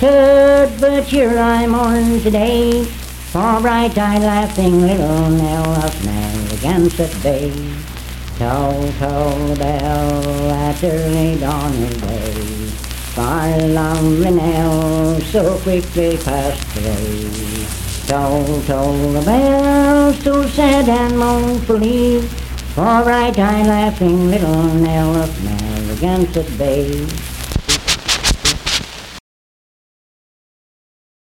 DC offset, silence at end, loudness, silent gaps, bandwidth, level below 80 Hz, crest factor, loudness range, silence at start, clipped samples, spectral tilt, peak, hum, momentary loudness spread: under 0.1%; 2.1 s; -15 LUFS; none; 17 kHz; -26 dBFS; 14 dB; 5 LU; 0 s; under 0.1%; -5.5 dB/octave; 0 dBFS; none; 10 LU